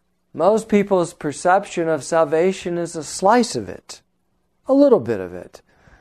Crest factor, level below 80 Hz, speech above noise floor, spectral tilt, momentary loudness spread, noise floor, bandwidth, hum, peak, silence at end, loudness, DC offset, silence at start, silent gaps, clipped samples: 18 dB; -58 dBFS; 50 dB; -5 dB/octave; 20 LU; -69 dBFS; 13.5 kHz; none; -2 dBFS; 0.6 s; -19 LUFS; under 0.1%; 0.35 s; none; under 0.1%